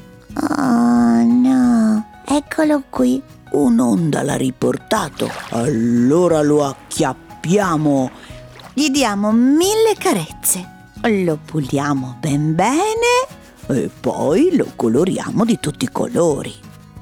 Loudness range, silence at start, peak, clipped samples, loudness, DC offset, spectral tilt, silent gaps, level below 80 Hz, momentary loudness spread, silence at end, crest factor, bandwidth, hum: 3 LU; 0.3 s; -4 dBFS; under 0.1%; -17 LUFS; under 0.1%; -5.5 dB/octave; none; -46 dBFS; 9 LU; 0 s; 12 dB; 17.5 kHz; none